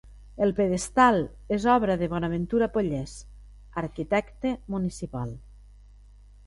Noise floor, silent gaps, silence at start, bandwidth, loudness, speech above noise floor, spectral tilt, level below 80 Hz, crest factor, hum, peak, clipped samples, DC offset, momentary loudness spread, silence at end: -51 dBFS; none; 0.05 s; 11.5 kHz; -26 LUFS; 25 dB; -6 dB/octave; -46 dBFS; 20 dB; 50 Hz at -45 dBFS; -6 dBFS; under 0.1%; under 0.1%; 14 LU; 0.95 s